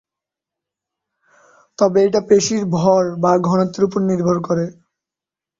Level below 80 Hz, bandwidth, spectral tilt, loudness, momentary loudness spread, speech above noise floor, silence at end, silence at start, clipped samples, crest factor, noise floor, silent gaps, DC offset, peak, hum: -56 dBFS; 7.8 kHz; -6 dB/octave; -16 LUFS; 5 LU; 72 dB; 0.85 s; 1.8 s; under 0.1%; 16 dB; -88 dBFS; none; under 0.1%; -2 dBFS; none